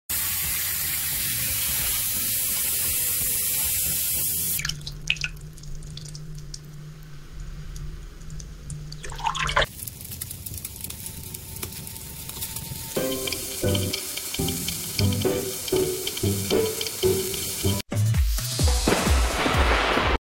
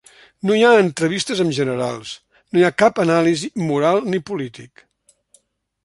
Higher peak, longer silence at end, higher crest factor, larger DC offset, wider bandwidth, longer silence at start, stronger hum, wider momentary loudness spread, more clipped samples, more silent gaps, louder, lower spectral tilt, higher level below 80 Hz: about the same, -4 dBFS vs -2 dBFS; second, 0.05 s vs 1.2 s; about the same, 22 dB vs 18 dB; neither; first, 17 kHz vs 11.5 kHz; second, 0.1 s vs 0.45 s; neither; first, 18 LU vs 14 LU; neither; neither; second, -24 LUFS vs -18 LUFS; second, -3 dB/octave vs -5 dB/octave; first, -34 dBFS vs -62 dBFS